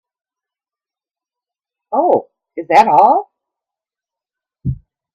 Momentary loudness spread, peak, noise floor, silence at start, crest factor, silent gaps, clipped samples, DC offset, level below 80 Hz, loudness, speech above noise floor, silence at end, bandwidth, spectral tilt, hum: 20 LU; 0 dBFS; under -90 dBFS; 1.9 s; 18 dB; none; under 0.1%; under 0.1%; -46 dBFS; -13 LUFS; over 79 dB; 0.4 s; 10.5 kHz; -7 dB/octave; none